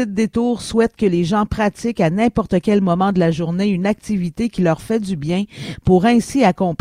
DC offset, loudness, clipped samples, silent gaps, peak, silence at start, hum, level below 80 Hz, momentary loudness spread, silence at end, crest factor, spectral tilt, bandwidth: under 0.1%; -18 LUFS; under 0.1%; none; 0 dBFS; 0 s; none; -40 dBFS; 6 LU; 0.05 s; 16 dB; -7 dB/octave; 13 kHz